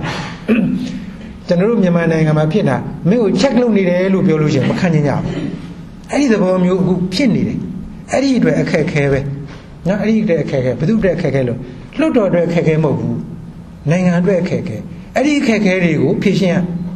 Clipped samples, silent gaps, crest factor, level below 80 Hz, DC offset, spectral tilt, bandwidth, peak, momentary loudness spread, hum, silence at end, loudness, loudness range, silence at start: under 0.1%; none; 14 dB; -40 dBFS; under 0.1%; -7 dB/octave; 10.5 kHz; -2 dBFS; 12 LU; none; 0 s; -15 LUFS; 3 LU; 0 s